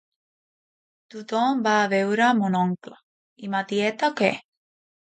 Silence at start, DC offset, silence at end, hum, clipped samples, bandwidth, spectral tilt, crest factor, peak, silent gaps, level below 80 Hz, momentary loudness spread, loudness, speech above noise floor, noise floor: 1.15 s; under 0.1%; 0.75 s; none; under 0.1%; 9 kHz; -5.5 dB/octave; 20 dB; -6 dBFS; 3.03-3.36 s; -74 dBFS; 16 LU; -23 LUFS; over 67 dB; under -90 dBFS